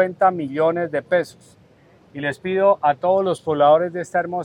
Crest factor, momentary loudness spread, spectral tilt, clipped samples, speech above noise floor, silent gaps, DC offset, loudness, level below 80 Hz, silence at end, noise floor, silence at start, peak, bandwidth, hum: 16 dB; 11 LU; -6.5 dB/octave; under 0.1%; 33 dB; none; under 0.1%; -19 LUFS; -64 dBFS; 0 s; -52 dBFS; 0 s; -4 dBFS; 11 kHz; none